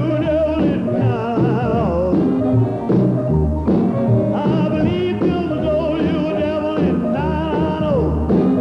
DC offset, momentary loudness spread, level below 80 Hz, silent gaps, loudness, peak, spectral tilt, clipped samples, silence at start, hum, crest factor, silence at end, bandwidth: under 0.1%; 3 LU; -32 dBFS; none; -18 LUFS; -4 dBFS; -9.5 dB/octave; under 0.1%; 0 s; none; 12 dB; 0 s; 6.6 kHz